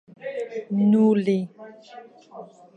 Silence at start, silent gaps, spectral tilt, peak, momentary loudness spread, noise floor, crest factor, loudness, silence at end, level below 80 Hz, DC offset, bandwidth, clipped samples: 0.2 s; none; -9 dB/octave; -8 dBFS; 25 LU; -46 dBFS; 16 dB; -22 LUFS; 0.3 s; -76 dBFS; under 0.1%; 8 kHz; under 0.1%